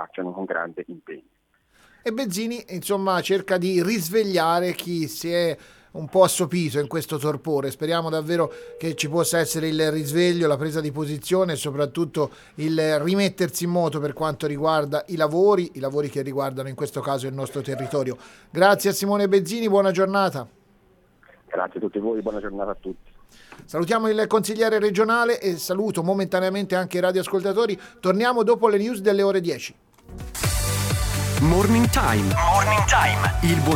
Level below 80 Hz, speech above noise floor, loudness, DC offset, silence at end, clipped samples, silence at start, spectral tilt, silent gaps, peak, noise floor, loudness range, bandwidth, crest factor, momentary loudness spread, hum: -40 dBFS; 37 dB; -22 LUFS; under 0.1%; 0 s; under 0.1%; 0 s; -5 dB/octave; none; -4 dBFS; -59 dBFS; 4 LU; 19 kHz; 20 dB; 11 LU; none